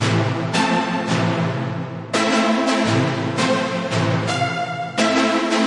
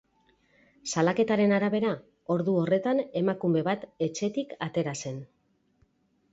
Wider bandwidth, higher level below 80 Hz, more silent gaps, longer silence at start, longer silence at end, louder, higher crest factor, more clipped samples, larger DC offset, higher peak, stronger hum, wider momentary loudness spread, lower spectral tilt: first, 11.5 kHz vs 8 kHz; first, -60 dBFS vs -68 dBFS; neither; second, 0 s vs 0.85 s; second, 0 s vs 1.05 s; first, -20 LUFS vs -28 LUFS; about the same, 14 dB vs 18 dB; neither; neither; first, -4 dBFS vs -10 dBFS; neither; second, 6 LU vs 10 LU; about the same, -5 dB/octave vs -6 dB/octave